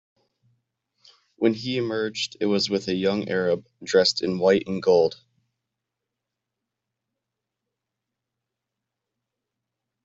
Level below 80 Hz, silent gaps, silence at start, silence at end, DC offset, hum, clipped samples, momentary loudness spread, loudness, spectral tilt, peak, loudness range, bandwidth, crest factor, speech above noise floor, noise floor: -68 dBFS; none; 1.4 s; 4.9 s; under 0.1%; none; under 0.1%; 7 LU; -23 LUFS; -4.5 dB/octave; -6 dBFS; 5 LU; 8 kHz; 22 dB; 62 dB; -85 dBFS